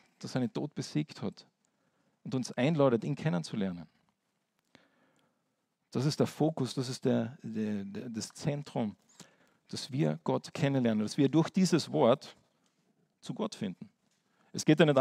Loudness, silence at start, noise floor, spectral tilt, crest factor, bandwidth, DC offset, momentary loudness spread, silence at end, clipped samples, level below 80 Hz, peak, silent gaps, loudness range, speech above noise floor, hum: -32 LUFS; 0.2 s; -80 dBFS; -6 dB/octave; 22 dB; 15 kHz; under 0.1%; 13 LU; 0 s; under 0.1%; -78 dBFS; -10 dBFS; none; 6 LU; 49 dB; none